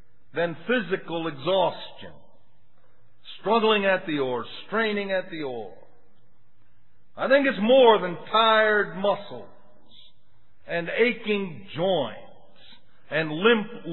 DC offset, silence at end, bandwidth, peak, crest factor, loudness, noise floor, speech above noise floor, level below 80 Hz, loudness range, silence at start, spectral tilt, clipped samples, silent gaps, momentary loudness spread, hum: 0.9%; 0 s; 4.2 kHz; -4 dBFS; 22 dB; -24 LUFS; -66 dBFS; 42 dB; -72 dBFS; 7 LU; 0.35 s; -8 dB/octave; under 0.1%; none; 16 LU; none